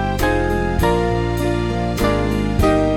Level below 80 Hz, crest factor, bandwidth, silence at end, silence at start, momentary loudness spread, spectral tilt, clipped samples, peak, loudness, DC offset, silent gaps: -26 dBFS; 14 dB; 17 kHz; 0 s; 0 s; 3 LU; -6.5 dB/octave; under 0.1%; -2 dBFS; -18 LUFS; under 0.1%; none